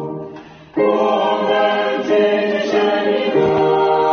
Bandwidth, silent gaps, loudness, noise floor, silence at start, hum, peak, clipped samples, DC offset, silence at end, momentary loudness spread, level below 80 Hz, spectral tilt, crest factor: 6.6 kHz; none; -16 LUFS; -36 dBFS; 0 s; none; -2 dBFS; under 0.1%; under 0.1%; 0 s; 7 LU; -56 dBFS; -3 dB/octave; 14 dB